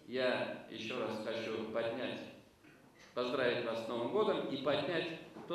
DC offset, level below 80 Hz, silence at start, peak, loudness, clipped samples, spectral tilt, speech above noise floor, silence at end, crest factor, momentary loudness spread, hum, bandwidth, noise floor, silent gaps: under 0.1%; -78 dBFS; 0.05 s; -20 dBFS; -38 LUFS; under 0.1%; -5.5 dB/octave; 25 dB; 0 s; 18 dB; 9 LU; none; 13 kHz; -62 dBFS; none